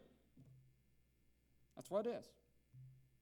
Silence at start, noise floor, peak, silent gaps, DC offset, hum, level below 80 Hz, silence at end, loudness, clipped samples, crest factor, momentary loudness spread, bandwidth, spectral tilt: 0 s; -76 dBFS; -28 dBFS; none; under 0.1%; none; -80 dBFS; 0.2 s; -45 LUFS; under 0.1%; 24 dB; 25 LU; 19 kHz; -6 dB/octave